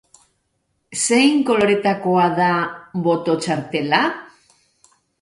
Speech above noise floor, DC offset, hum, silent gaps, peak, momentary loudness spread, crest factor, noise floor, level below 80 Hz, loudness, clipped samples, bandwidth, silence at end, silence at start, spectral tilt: 52 dB; under 0.1%; none; none; -2 dBFS; 8 LU; 18 dB; -70 dBFS; -62 dBFS; -18 LUFS; under 0.1%; 11.5 kHz; 0.95 s; 0.9 s; -4 dB/octave